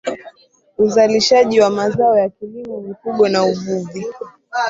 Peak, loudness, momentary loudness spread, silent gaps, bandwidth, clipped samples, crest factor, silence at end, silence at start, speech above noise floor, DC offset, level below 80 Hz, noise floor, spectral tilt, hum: -2 dBFS; -15 LUFS; 17 LU; none; 7.8 kHz; under 0.1%; 16 dB; 0 s; 0.05 s; 34 dB; under 0.1%; -58 dBFS; -50 dBFS; -4.5 dB/octave; none